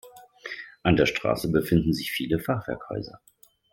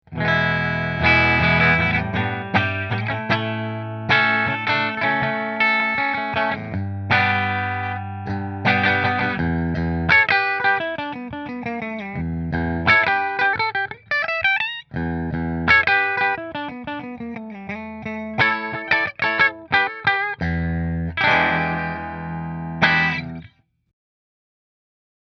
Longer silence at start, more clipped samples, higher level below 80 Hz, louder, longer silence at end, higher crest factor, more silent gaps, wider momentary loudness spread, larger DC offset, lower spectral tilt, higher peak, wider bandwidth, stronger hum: about the same, 0.05 s vs 0.1 s; neither; second, -48 dBFS vs -42 dBFS; second, -26 LUFS vs -20 LUFS; second, 0.55 s vs 1.85 s; about the same, 20 dB vs 22 dB; neither; about the same, 16 LU vs 14 LU; neither; about the same, -6 dB/octave vs -6.5 dB/octave; second, -6 dBFS vs 0 dBFS; first, 17 kHz vs 6.4 kHz; neither